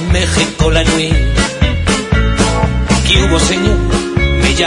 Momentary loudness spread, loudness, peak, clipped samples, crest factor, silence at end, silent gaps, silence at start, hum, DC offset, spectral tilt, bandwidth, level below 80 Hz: 4 LU; -12 LUFS; 0 dBFS; under 0.1%; 12 dB; 0 s; none; 0 s; none; under 0.1%; -4.5 dB/octave; 11 kHz; -16 dBFS